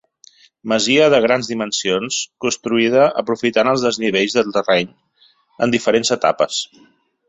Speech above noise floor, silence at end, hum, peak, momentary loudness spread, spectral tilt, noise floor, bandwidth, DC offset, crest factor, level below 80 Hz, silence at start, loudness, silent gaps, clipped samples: 33 dB; 0.65 s; none; 0 dBFS; 9 LU; -3.5 dB/octave; -50 dBFS; 8.4 kHz; under 0.1%; 18 dB; -60 dBFS; 0.65 s; -17 LUFS; none; under 0.1%